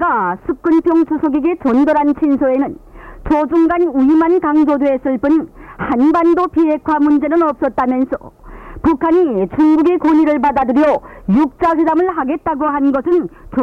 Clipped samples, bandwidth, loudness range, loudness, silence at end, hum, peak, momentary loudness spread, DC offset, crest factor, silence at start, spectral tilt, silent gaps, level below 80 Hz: under 0.1%; 5.6 kHz; 1 LU; -14 LUFS; 0 s; none; -6 dBFS; 7 LU; under 0.1%; 8 dB; 0 s; -8.5 dB/octave; none; -40 dBFS